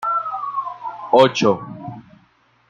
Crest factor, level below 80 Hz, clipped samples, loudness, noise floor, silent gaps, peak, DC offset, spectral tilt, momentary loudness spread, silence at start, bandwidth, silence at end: 18 dB; -62 dBFS; under 0.1%; -18 LUFS; -58 dBFS; none; -2 dBFS; under 0.1%; -5 dB/octave; 19 LU; 0 s; 8 kHz; 0.7 s